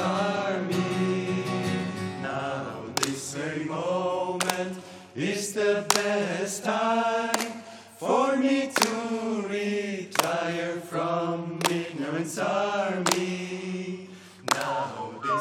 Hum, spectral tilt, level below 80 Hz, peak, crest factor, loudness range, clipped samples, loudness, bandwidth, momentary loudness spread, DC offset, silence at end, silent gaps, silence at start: none; -4 dB/octave; -74 dBFS; 0 dBFS; 28 dB; 3 LU; under 0.1%; -28 LUFS; 18 kHz; 9 LU; under 0.1%; 0 s; none; 0 s